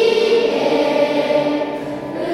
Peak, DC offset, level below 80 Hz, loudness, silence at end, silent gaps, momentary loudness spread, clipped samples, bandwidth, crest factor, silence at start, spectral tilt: -2 dBFS; under 0.1%; -56 dBFS; -17 LUFS; 0 s; none; 9 LU; under 0.1%; 12.5 kHz; 14 dB; 0 s; -5 dB/octave